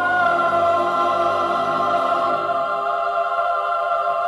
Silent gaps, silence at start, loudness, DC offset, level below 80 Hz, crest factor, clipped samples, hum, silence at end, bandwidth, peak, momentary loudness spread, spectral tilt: none; 0 s; -19 LUFS; under 0.1%; -60 dBFS; 12 dB; under 0.1%; none; 0 s; 11.5 kHz; -8 dBFS; 4 LU; -5 dB/octave